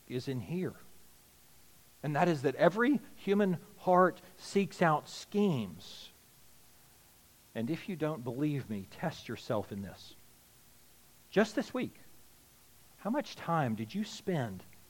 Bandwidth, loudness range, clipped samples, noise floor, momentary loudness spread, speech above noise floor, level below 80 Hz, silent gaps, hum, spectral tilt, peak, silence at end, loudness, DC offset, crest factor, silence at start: 17.5 kHz; 9 LU; under 0.1%; -62 dBFS; 15 LU; 29 dB; -72 dBFS; none; none; -6.5 dB/octave; -10 dBFS; 0.15 s; -33 LUFS; under 0.1%; 24 dB; 0.1 s